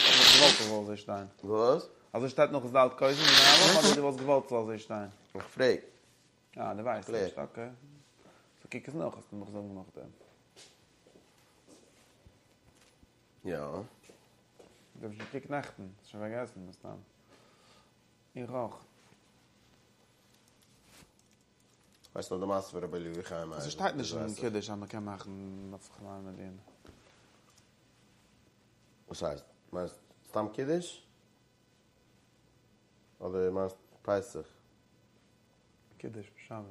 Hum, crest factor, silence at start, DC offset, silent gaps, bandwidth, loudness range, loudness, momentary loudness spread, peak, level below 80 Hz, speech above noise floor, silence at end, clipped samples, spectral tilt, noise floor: none; 28 dB; 0 s; under 0.1%; none; 15 kHz; 23 LU; -28 LUFS; 25 LU; -6 dBFS; -68 dBFS; 36 dB; 0 s; under 0.1%; -2 dB/octave; -68 dBFS